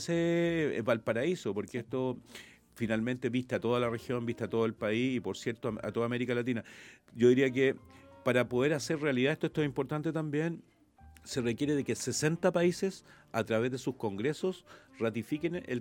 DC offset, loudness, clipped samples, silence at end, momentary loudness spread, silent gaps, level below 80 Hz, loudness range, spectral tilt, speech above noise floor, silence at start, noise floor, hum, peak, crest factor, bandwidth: under 0.1%; -32 LUFS; under 0.1%; 0 s; 9 LU; none; -66 dBFS; 4 LU; -5.5 dB/octave; 26 dB; 0 s; -58 dBFS; none; -12 dBFS; 20 dB; 17 kHz